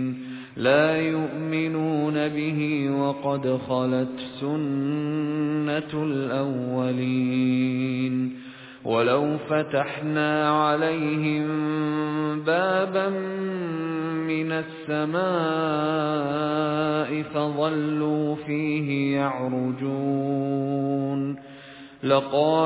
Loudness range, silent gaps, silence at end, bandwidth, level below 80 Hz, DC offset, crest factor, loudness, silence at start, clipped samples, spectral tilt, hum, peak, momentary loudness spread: 2 LU; none; 0 s; 4 kHz; -66 dBFS; under 0.1%; 18 dB; -25 LUFS; 0 s; under 0.1%; -11 dB/octave; none; -8 dBFS; 7 LU